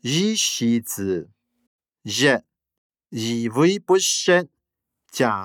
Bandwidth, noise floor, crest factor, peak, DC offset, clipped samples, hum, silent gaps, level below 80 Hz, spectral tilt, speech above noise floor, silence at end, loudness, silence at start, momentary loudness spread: 19 kHz; -82 dBFS; 18 dB; -4 dBFS; under 0.1%; under 0.1%; none; 1.67-1.79 s, 2.78-2.90 s; -72 dBFS; -3.5 dB/octave; 62 dB; 0 s; -21 LUFS; 0.05 s; 13 LU